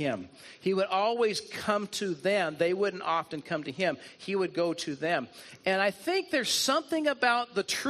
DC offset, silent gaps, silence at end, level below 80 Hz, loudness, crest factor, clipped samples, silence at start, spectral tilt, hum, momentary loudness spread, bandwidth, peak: under 0.1%; none; 0 s; -76 dBFS; -29 LUFS; 20 dB; under 0.1%; 0 s; -3.5 dB/octave; none; 8 LU; 13.5 kHz; -10 dBFS